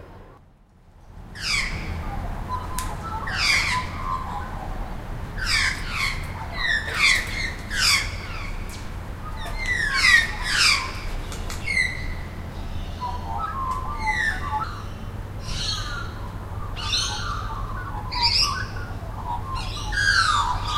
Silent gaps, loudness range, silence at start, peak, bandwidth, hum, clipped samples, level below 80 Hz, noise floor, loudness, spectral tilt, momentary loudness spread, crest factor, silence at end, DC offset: none; 7 LU; 0 s; -4 dBFS; 16 kHz; none; under 0.1%; -34 dBFS; -52 dBFS; -24 LUFS; -2 dB/octave; 16 LU; 22 dB; 0 s; under 0.1%